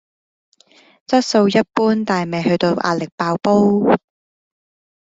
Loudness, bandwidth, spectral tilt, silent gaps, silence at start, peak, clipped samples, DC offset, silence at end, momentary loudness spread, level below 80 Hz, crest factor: -17 LUFS; 7.8 kHz; -6 dB/octave; 3.12-3.18 s; 1.1 s; -2 dBFS; under 0.1%; under 0.1%; 1.05 s; 6 LU; -58 dBFS; 16 dB